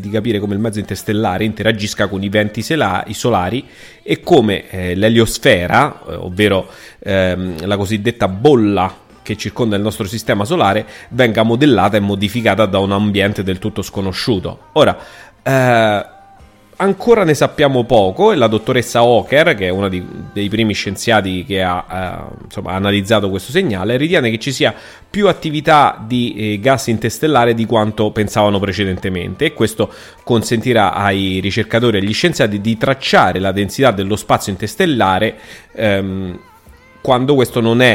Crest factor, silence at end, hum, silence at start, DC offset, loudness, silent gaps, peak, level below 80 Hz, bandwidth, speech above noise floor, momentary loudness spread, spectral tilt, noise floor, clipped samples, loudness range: 14 dB; 0 s; none; 0 s; under 0.1%; -15 LUFS; none; 0 dBFS; -42 dBFS; 17 kHz; 29 dB; 10 LU; -5.5 dB/octave; -43 dBFS; 0.1%; 3 LU